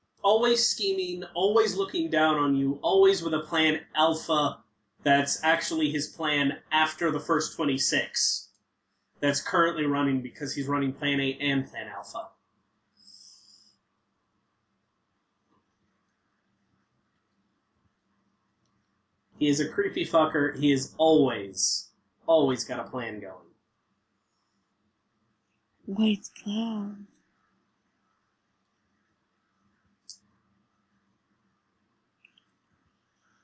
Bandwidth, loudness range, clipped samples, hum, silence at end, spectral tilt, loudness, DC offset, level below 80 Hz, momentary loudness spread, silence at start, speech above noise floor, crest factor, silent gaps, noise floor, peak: 8 kHz; 11 LU; under 0.1%; none; 3.3 s; -3.5 dB/octave; -26 LUFS; under 0.1%; -70 dBFS; 11 LU; 0.25 s; 51 dB; 18 dB; none; -77 dBFS; -10 dBFS